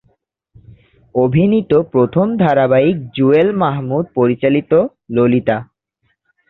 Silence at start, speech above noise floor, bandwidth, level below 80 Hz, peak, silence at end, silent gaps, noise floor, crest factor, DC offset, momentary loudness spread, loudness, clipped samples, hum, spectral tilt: 1.15 s; 53 dB; 4.3 kHz; -50 dBFS; 0 dBFS; 0.85 s; none; -66 dBFS; 14 dB; under 0.1%; 7 LU; -14 LUFS; under 0.1%; none; -10.5 dB/octave